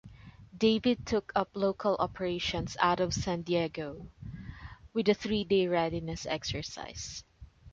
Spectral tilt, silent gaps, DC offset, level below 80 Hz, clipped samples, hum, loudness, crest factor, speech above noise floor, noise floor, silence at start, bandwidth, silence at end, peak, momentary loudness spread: -5 dB/octave; none; under 0.1%; -52 dBFS; under 0.1%; none; -31 LUFS; 22 dB; 21 dB; -51 dBFS; 0.05 s; 7.8 kHz; 0.05 s; -10 dBFS; 17 LU